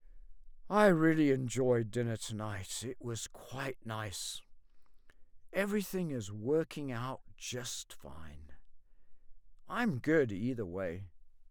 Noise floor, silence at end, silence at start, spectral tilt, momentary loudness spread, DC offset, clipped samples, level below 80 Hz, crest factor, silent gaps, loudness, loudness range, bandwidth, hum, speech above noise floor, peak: -55 dBFS; 0.05 s; 0 s; -5.5 dB/octave; 16 LU; under 0.1%; under 0.1%; -60 dBFS; 22 dB; none; -35 LUFS; 10 LU; over 20 kHz; none; 21 dB; -14 dBFS